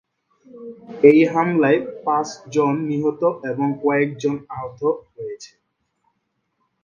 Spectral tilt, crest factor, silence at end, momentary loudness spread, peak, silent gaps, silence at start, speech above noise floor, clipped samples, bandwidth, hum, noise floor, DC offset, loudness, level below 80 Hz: -7 dB/octave; 20 dB; 1.35 s; 19 LU; 0 dBFS; none; 0.55 s; 53 dB; under 0.1%; 7.2 kHz; none; -72 dBFS; under 0.1%; -19 LUFS; -64 dBFS